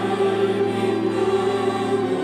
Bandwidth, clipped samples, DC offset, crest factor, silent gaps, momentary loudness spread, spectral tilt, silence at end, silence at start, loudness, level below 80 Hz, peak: 10.5 kHz; under 0.1%; under 0.1%; 12 dB; none; 2 LU; -6 dB/octave; 0 s; 0 s; -21 LUFS; -62 dBFS; -8 dBFS